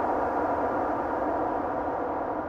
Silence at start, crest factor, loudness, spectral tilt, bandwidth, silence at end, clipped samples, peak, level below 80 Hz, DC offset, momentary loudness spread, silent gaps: 0 s; 14 dB; -28 LUFS; -8 dB/octave; 7.6 kHz; 0 s; under 0.1%; -14 dBFS; -52 dBFS; under 0.1%; 3 LU; none